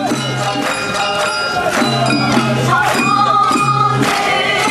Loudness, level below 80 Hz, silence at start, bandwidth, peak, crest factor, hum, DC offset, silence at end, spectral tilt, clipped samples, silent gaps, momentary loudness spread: -14 LUFS; -46 dBFS; 0 s; 13.5 kHz; -2 dBFS; 12 dB; none; under 0.1%; 0 s; -4 dB/octave; under 0.1%; none; 5 LU